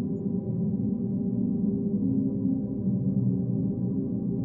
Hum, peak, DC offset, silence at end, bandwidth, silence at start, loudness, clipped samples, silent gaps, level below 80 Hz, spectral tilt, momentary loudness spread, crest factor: none; -16 dBFS; under 0.1%; 0 s; 1.3 kHz; 0 s; -28 LUFS; under 0.1%; none; -54 dBFS; -16 dB/octave; 3 LU; 12 dB